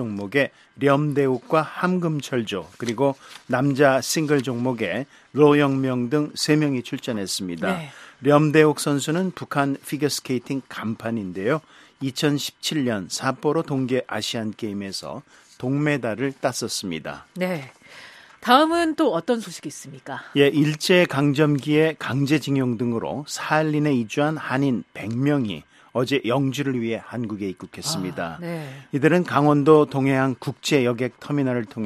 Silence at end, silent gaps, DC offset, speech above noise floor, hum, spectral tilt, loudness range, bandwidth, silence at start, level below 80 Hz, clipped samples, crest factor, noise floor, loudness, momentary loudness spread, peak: 0 s; none; under 0.1%; 23 dB; none; -5.5 dB/octave; 5 LU; 14.5 kHz; 0 s; -64 dBFS; under 0.1%; 20 dB; -45 dBFS; -22 LUFS; 12 LU; -2 dBFS